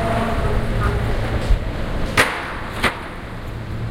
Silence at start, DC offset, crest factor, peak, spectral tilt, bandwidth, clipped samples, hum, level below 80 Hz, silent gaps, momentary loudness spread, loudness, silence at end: 0 s; under 0.1%; 20 dB; 0 dBFS; -5 dB/octave; 16.5 kHz; under 0.1%; none; -24 dBFS; none; 13 LU; -22 LUFS; 0 s